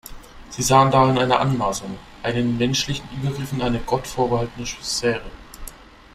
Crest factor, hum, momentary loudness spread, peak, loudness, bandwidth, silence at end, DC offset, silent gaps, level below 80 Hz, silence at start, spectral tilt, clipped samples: 20 dB; none; 22 LU; -2 dBFS; -21 LUFS; 16 kHz; 0.35 s; under 0.1%; none; -42 dBFS; 0.05 s; -4.5 dB/octave; under 0.1%